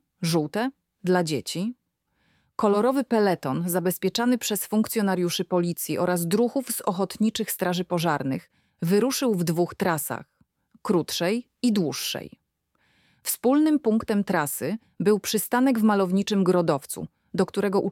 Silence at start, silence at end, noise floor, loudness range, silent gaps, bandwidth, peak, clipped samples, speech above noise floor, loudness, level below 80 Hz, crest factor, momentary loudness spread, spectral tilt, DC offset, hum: 0.2 s; 0 s; -71 dBFS; 3 LU; none; 17.5 kHz; -8 dBFS; under 0.1%; 47 dB; -25 LUFS; -66 dBFS; 18 dB; 9 LU; -5 dB/octave; under 0.1%; none